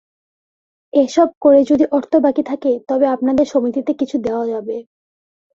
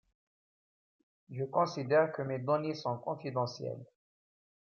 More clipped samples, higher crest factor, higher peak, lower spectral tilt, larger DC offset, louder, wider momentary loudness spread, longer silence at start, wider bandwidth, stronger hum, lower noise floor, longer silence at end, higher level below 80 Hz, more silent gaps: neither; about the same, 16 dB vs 20 dB; first, -2 dBFS vs -16 dBFS; about the same, -6 dB/octave vs -6.5 dB/octave; neither; first, -16 LUFS vs -34 LUFS; second, 9 LU vs 13 LU; second, 0.95 s vs 1.3 s; about the same, 7.6 kHz vs 7 kHz; neither; about the same, under -90 dBFS vs under -90 dBFS; about the same, 0.75 s vs 0.8 s; first, -56 dBFS vs -84 dBFS; first, 1.37-1.41 s vs none